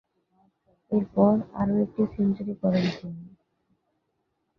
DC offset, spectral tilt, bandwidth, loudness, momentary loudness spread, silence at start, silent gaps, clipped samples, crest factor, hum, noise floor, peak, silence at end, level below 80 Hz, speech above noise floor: under 0.1%; -9 dB/octave; 6.2 kHz; -25 LUFS; 12 LU; 0.9 s; none; under 0.1%; 20 dB; none; -76 dBFS; -6 dBFS; 1.3 s; -58 dBFS; 51 dB